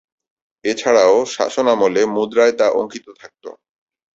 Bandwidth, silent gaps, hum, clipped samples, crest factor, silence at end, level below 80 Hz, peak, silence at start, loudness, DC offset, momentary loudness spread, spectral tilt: 8 kHz; none; none; under 0.1%; 16 dB; 0.65 s; -62 dBFS; -2 dBFS; 0.65 s; -16 LUFS; under 0.1%; 16 LU; -3.5 dB/octave